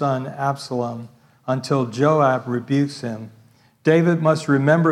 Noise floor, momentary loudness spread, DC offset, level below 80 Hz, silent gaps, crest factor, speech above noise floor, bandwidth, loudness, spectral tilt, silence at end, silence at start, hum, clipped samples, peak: -51 dBFS; 14 LU; under 0.1%; -68 dBFS; none; 16 dB; 32 dB; 12 kHz; -20 LUFS; -7 dB/octave; 0 s; 0 s; none; under 0.1%; -4 dBFS